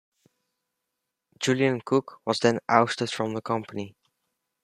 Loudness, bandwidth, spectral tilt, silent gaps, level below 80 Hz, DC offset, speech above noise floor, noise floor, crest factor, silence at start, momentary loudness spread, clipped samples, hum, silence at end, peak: -25 LUFS; 13 kHz; -5 dB/octave; none; -70 dBFS; under 0.1%; 58 dB; -83 dBFS; 26 dB; 1.4 s; 10 LU; under 0.1%; none; 0.75 s; -2 dBFS